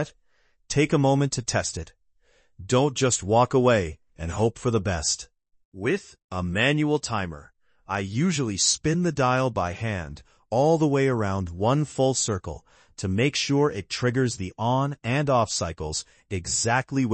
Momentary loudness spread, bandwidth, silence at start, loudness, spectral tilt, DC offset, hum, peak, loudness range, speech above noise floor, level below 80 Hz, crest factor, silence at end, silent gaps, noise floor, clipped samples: 12 LU; 8.8 kHz; 0 s; -24 LUFS; -4.5 dB/octave; under 0.1%; none; -8 dBFS; 3 LU; 43 dB; -52 dBFS; 18 dB; 0 s; 5.65-5.72 s, 6.24-6.29 s; -67 dBFS; under 0.1%